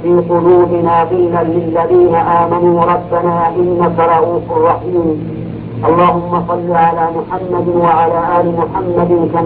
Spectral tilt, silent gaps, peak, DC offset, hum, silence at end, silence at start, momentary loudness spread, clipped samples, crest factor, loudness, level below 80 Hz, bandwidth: -12 dB/octave; none; 0 dBFS; under 0.1%; none; 0 s; 0 s; 6 LU; under 0.1%; 12 dB; -12 LUFS; -40 dBFS; 4.3 kHz